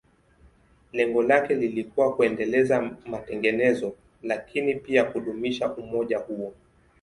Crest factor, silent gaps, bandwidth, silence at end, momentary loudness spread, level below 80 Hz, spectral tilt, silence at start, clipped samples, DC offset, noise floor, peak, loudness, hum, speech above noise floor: 20 dB; none; 11.5 kHz; 0.5 s; 13 LU; -60 dBFS; -6 dB/octave; 0.95 s; under 0.1%; under 0.1%; -58 dBFS; -6 dBFS; -25 LUFS; none; 33 dB